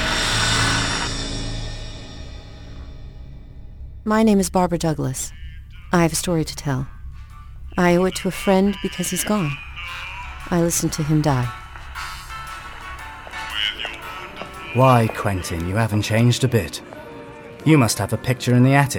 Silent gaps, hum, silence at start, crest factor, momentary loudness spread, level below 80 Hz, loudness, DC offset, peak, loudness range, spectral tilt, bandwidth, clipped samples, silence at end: none; none; 0 s; 20 dB; 22 LU; -36 dBFS; -20 LUFS; under 0.1%; -2 dBFS; 5 LU; -5 dB/octave; 19.5 kHz; under 0.1%; 0 s